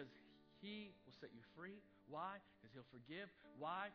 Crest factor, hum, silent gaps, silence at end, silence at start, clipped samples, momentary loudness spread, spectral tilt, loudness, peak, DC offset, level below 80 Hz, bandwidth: 20 dB; none; none; 0 s; 0 s; under 0.1%; 12 LU; -3 dB/octave; -56 LUFS; -36 dBFS; under 0.1%; -88 dBFS; 5.4 kHz